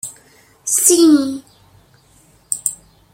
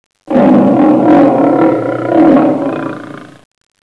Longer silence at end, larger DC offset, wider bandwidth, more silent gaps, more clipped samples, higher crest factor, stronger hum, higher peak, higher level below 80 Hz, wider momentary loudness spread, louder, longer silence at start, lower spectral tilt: second, 0.4 s vs 0.6 s; second, under 0.1% vs 0.3%; first, 16.5 kHz vs 5.8 kHz; neither; second, under 0.1% vs 0.6%; first, 18 dB vs 10 dB; neither; about the same, 0 dBFS vs 0 dBFS; second, -60 dBFS vs -50 dBFS; first, 19 LU vs 13 LU; second, -14 LUFS vs -9 LUFS; second, 0.05 s vs 0.25 s; second, -2 dB/octave vs -9 dB/octave